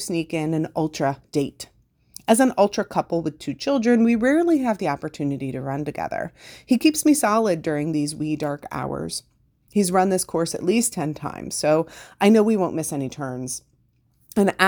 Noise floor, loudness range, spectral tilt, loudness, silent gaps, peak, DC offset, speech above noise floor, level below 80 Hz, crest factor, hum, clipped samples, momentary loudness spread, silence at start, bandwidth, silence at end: -63 dBFS; 3 LU; -5 dB/octave; -22 LUFS; none; 0 dBFS; under 0.1%; 42 dB; -56 dBFS; 22 dB; none; under 0.1%; 12 LU; 0 s; over 20 kHz; 0 s